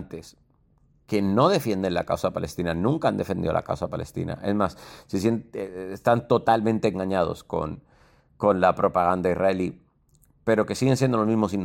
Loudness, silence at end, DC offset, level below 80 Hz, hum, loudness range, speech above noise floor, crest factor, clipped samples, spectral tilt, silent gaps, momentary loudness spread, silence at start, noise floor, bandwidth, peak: -24 LUFS; 0 s; under 0.1%; -52 dBFS; none; 3 LU; 38 dB; 18 dB; under 0.1%; -6.5 dB/octave; none; 11 LU; 0 s; -62 dBFS; 16.5 kHz; -6 dBFS